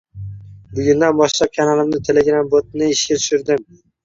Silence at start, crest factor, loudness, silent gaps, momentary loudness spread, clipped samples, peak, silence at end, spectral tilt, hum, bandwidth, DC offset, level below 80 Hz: 0.15 s; 14 dB; -16 LUFS; none; 12 LU; under 0.1%; -2 dBFS; 0.4 s; -4 dB/octave; none; 7.8 kHz; under 0.1%; -48 dBFS